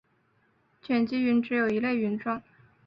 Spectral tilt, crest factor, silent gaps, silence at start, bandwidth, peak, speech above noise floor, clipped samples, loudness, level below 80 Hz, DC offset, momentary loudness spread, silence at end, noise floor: -8 dB/octave; 14 dB; none; 0.85 s; 5.6 kHz; -14 dBFS; 42 dB; under 0.1%; -27 LUFS; -68 dBFS; under 0.1%; 7 LU; 0.45 s; -68 dBFS